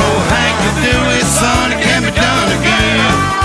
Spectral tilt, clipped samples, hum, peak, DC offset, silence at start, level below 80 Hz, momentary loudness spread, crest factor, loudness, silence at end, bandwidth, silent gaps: -3.5 dB/octave; under 0.1%; none; 0 dBFS; under 0.1%; 0 s; -26 dBFS; 1 LU; 12 dB; -11 LUFS; 0 s; 11 kHz; none